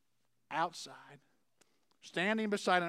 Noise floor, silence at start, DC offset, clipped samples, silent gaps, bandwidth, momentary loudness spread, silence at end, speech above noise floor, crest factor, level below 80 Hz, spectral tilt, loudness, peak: -83 dBFS; 0.5 s; under 0.1%; under 0.1%; none; 14.5 kHz; 16 LU; 0 s; 48 dB; 22 dB; under -90 dBFS; -4 dB/octave; -36 LUFS; -14 dBFS